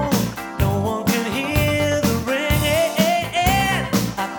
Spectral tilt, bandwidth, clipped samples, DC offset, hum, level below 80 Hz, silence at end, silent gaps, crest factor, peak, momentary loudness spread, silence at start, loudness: -4.5 dB/octave; over 20 kHz; under 0.1%; under 0.1%; none; -32 dBFS; 0 s; none; 16 dB; -4 dBFS; 4 LU; 0 s; -19 LUFS